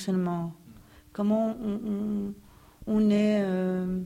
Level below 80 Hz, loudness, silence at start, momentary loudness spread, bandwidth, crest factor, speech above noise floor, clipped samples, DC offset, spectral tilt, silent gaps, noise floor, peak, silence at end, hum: -56 dBFS; -28 LUFS; 0 s; 15 LU; 11 kHz; 14 dB; 25 dB; under 0.1%; under 0.1%; -8 dB/octave; none; -52 dBFS; -14 dBFS; 0 s; none